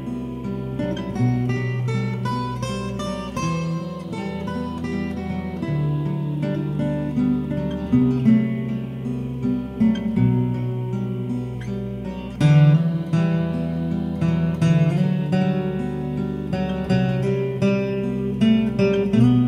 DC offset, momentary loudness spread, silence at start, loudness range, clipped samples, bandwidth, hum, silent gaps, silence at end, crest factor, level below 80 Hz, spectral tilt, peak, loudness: under 0.1%; 10 LU; 0 s; 6 LU; under 0.1%; 10.5 kHz; none; none; 0 s; 16 dB; -42 dBFS; -8 dB/octave; -4 dBFS; -22 LUFS